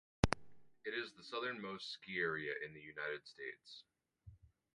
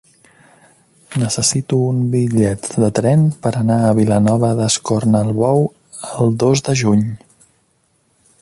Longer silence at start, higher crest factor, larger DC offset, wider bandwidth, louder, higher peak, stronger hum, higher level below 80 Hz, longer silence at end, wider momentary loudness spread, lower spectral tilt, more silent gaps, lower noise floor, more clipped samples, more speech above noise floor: second, 0.25 s vs 1.1 s; first, 32 dB vs 14 dB; neither; about the same, 11.5 kHz vs 11.5 kHz; second, -43 LUFS vs -16 LUFS; second, -12 dBFS vs -2 dBFS; neither; second, -58 dBFS vs -48 dBFS; second, 0.25 s vs 1.25 s; first, 17 LU vs 7 LU; about the same, -5 dB/octave vs -6 dB/octave; neither; about the same, -63 dBFS vs -61 dBFS; neither; second, 18 dB vs 46 dB